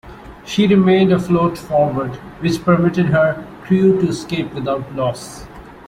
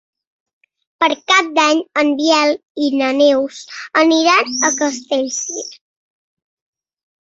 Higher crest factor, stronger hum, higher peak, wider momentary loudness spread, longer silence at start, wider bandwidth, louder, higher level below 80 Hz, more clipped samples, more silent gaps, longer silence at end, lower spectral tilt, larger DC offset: about the same, 16 dB vs 16 dB; neither; about the same, -2 dBFS vs 0 dBFS; first, 14 LU vs 10 LU; second, 0.05 s vs 1 s; first, 12.5 kHz vs 8 kHz; about the same, -16 LUFS vs -15 LUFS; first, -44 dBFS vs -66 dBFS; neither; second, none vs 2.70-2.75 s; second, 0.1 s vs 1.5 s; first, -7 dB/octave vs -0.5 dB/octave; neither